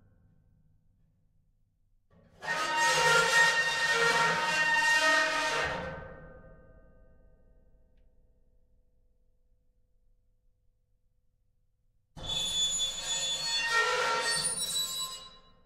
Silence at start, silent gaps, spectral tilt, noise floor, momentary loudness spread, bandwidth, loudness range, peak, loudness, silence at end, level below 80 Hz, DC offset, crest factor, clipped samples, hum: 2.4 s; none; -0.5 dB/octave; -71 dBFS; 14 LU; 16 kHz; 11 LU; -12 dBFS; -27 LUFS; 0.35 s; -58 dBFS; under 0.1%; 20 dB; under 0.1%; none